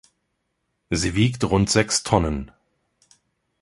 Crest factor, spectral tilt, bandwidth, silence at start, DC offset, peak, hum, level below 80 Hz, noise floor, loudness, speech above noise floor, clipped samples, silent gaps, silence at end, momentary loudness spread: 22 dB; -4.5 dB/octave; 11.5 kHz; 0.9 s; under 0.1%; -2 dBFS; none; -38 dBFS; -75 dBFS; -21 LUFS; 54 dB; under 0.1%; none; 1.15 s; 10 LU